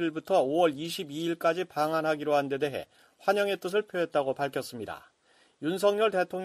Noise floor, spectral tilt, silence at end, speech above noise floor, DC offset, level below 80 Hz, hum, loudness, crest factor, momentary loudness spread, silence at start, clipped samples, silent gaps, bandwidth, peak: -65 dBFS; -5 dB/octave; 0 s; 36 dB; under 0.1%; -74 dBFS; none; -29 LUFS; 18 dB; 10 LU; 0 s; under 0.1%; none; 15 kHz; -12 dBFS